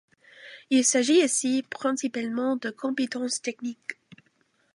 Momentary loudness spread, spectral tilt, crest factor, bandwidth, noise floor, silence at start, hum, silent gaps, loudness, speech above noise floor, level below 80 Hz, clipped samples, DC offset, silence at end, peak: 15 LU; -2 dB/octave; 18 dB; 11.5 kHz; -68 dBFS; 0.4 s; none; none; -25 LUFS; 43 dB; -82 dBFS; under 0.1%; under 0.1%; 0.85 s; -10 dBFS